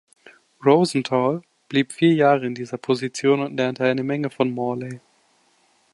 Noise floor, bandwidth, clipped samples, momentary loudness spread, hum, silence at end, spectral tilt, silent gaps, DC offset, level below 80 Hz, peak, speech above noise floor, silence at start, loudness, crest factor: -62 dBFS; 11.5 kHz; under 0.1%; 12 LU; none; 0.95 s; -6 dB/octave; none; under 0.1%; -68 dBFS; -4 dBFS; 41 dB; 0.6 s; -21 LUFS; 18 dB